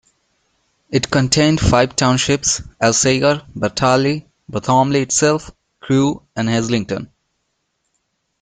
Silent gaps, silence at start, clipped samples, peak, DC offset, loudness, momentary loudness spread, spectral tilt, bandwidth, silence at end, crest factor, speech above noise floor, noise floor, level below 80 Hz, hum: none; 0.9 s; under 0.1%; 0 dBFS; under 0.1%; -16 LUFS; 9 LU; -4 dB/octave; 9.6 kHz; 1.35 s; 18 dB; 54 dB; -70 dBFS; -40 dBFS; none